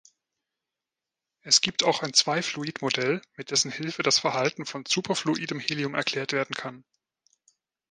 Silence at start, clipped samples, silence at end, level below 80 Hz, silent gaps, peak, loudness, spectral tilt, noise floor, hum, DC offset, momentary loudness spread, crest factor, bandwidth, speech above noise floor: 1.45 s; under 0.1%; 1.1 s; -72 dBFS; none; -4 dBFS; -25 LUFS; -2 dB/octave; -89 dBFS; none; under 0.1%; 10 LU; 24 dB; 11 kHz; 62 dB